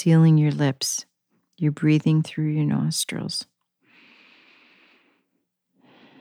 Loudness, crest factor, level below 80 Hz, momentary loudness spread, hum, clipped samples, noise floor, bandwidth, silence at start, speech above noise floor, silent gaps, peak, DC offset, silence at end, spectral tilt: -22 LUFS; 14 dB; -76 dBFS; 13 LU; none; under 0.1%; -75 dBFS; 15 kHz; 0 s; 55 dB; none; -8 dBFS; under 0.1%; 2.8 s; -5.5 dB/octave